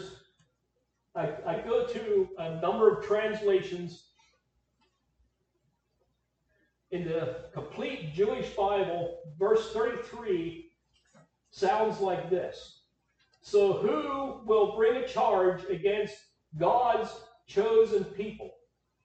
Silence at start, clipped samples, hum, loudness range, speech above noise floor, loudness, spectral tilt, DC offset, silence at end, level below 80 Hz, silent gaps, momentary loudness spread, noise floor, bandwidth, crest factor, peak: 0 s; under 0.1%; none; 9 LU; 49 dB; -29 LUFS; -6 dB/octave; under 0.1%; 0.55 s; -64 dBFS; none; 15 LU; -78 dBFS; 8.4 kHz; 20 dB; -10 dBFS